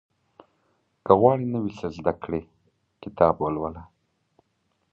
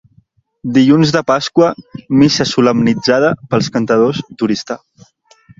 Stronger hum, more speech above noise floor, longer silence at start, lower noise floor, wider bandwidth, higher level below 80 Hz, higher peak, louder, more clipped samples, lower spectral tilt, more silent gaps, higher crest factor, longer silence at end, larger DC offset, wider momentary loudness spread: neither; first, 49 dB vs 41 dB; first, 1.05 s vs 0.65 s; first, -72 dBFS vs -54 dBFS; second, 7 kHz vs 7.8 kHz; about the same, -52 dBFS vs -50 dBFS; about the same, -2 dBFS vs 0 dBFS; second, -24 LUFS vs -13 LUFS; neither; first, -9 dB/octave vs -5.5 dB/octave; neither; first, 24 dB vs 14 dB; first, 1.1 s vs 0.85 s; neither; first, 21 LU vs 9 LU